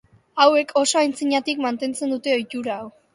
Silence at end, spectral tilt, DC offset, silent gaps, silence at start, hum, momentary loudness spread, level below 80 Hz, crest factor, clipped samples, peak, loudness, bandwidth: 0.25 s; -2 dB/octave; under 0.1%; none; 0.35 s; none; 12 LU; -70 dBFS; 20 dB; under 0.1%; -2 dBFS; -21 LUFS; 11.5 kHz